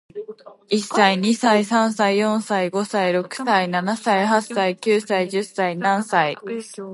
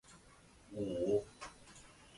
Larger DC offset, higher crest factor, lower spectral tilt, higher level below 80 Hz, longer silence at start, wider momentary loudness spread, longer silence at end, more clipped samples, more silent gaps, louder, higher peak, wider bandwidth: neither; about the same, 18 dB vs 20 dB; second, -4.5 dB/octave vs -6 dB/octave; second, -72 dBFS vs -66 dBFS; about the same, 0.15 s vs 0.1 s; second, 7 LU vs 23 LU; about the same, 0 s vs 0 s; neither; neither; first, -20 LUFS vs -39 LUFS; first, -2 dBFS vs -22 dBFS; about the same, 11.5 kHz vs 11.5 kHz